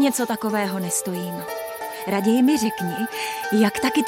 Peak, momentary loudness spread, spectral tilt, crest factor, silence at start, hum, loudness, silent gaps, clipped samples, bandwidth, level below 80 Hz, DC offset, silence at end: -6 dBFS; 12 LU; -4 dB/octave; 16 dB; 0 s; none; -23 LUFS; none; under 0.1%; 17 kHz; -62 dBFS; under 0.1%; 0 s